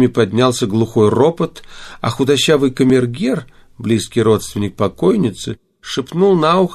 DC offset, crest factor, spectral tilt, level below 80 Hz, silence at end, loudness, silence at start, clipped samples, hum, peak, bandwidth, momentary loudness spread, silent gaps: under 0.1%; 14 dB; -6 dB/octave; -46 dBFS; 0 s; -15 LUFS; 0 s; under 0.1%; none; 0 dBFS; 14 kHz; 12 LU; none